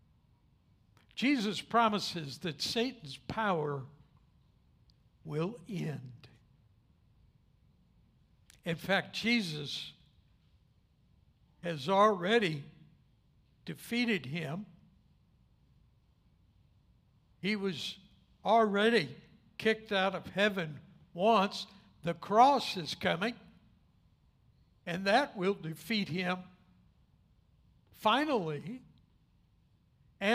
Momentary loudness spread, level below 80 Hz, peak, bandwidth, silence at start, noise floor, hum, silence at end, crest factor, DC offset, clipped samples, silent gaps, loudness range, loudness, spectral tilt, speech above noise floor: 19 LU; -70 dBFS; -12 dBFS; 15.5 kHz; 1.15 s; -68 dBFS; none; 0 s; 22 dB; under 0.1%; under 0.1%; none; 12 LU; -32 LUFS; -5 dB/octave; 37 dB